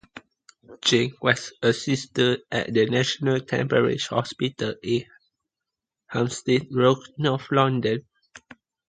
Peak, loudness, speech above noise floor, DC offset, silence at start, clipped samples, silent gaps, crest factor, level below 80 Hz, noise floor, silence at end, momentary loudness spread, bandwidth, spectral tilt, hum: -2 dBFS; -24 LUFS; 63 dB; under 0.1%; 0.15 s; under 0.1%; none; 22 dB; -60 dBFS; -87 dBFS; 0.5 s; 6 LU; 9.4 kHz; -5 dB/octave; none